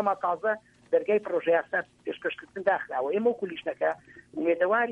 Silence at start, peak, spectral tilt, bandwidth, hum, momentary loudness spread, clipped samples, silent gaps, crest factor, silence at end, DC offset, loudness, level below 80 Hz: 0 s; -10 dBFS; -6.5 dB/octave; 5.8 kHz; none; 9 LU; under 0.1%; none; 18 dB; 0 s; under 0.1%; -28 LUFS; -72 dBFS